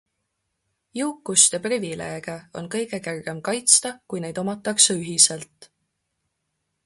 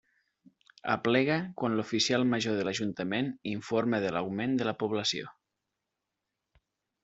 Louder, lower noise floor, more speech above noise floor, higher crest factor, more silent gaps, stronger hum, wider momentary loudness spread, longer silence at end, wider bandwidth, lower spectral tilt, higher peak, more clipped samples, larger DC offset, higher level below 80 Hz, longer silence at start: first, -20 LUFS vs -30 LUFS; second, -77 dBFS vs -86 dBFS; about the same, 54 dB vs 56 dB; about the same, 24 dB vs 22 dB; neither; neither; first, 16 LU vs 7 LU; second, 1.2 s vs 1.7 s; first, 12 kHz vs 8 kHz; second, -1.5 dB/octave vs -4.5 dB/octave; first, 0 dBFS vs -10 dBFS; neither; neither; about the same, -66 dBFS vs -70 dBFS; about the same, 0.95 s vs 0.85 s